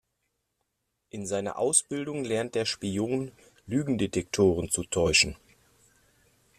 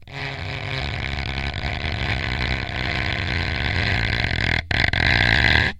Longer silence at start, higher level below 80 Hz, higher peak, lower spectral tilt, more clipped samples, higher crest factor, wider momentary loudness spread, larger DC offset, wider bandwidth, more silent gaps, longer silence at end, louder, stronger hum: first, 1.15 s vs 0 s; second, -54 dBFS vs -30 dBFS; second, -6 dBFS vs 0 dBFS; second, -3.5 dB/octave vs -5 dB/octave; neither; about the same, 22 dB vs 22 dB; about the same, 10 LU vs 10 LU; neither; first, 14.5 kHz vs 10.5 kHz; neither; first, 1.25 s vs 0 s; second, -27 LUFS vs -21 LUFS; neither